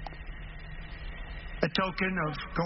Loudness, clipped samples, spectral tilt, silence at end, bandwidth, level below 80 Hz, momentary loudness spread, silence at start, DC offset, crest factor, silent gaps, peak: -33 LUFS; under 0.1%; -3.5 dB/octave; 0 s; 5.8 kHz; -42 dBFS; 15 LU; 0 s; under 0.1%; 24 dB; none; -10 dBFS